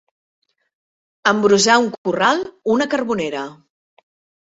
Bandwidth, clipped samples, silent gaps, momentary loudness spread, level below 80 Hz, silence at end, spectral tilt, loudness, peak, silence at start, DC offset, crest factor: 8.2 kHz; under 0.1%; 1.98-2.04 s; 11 LU; -60 dBFS; 0.9 s; -3.5 dB/octave; -17 LUFS; -2 dBFS; 1.25 s; under 0.1%; 18 dB